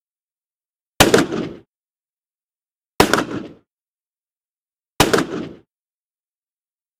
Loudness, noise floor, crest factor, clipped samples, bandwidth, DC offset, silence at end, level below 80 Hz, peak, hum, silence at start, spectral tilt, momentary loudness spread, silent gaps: -17 LUFS; under -90 dBFS; 22 dB; under 0.1%; 16 kHz; under 0.1%; 1.45 s; -44 dBFS; 0 dBFS; none; 1 s; -3.5 dB/octave; 18 LU; 1.68-2.00 s, 2.09-2.22 s, 2.34-2.49 s, 2.71-2.81 s, 2.87-2.98 s, 3.71-3.95 s, 4.07-4.11 s, 4.50-4.66 s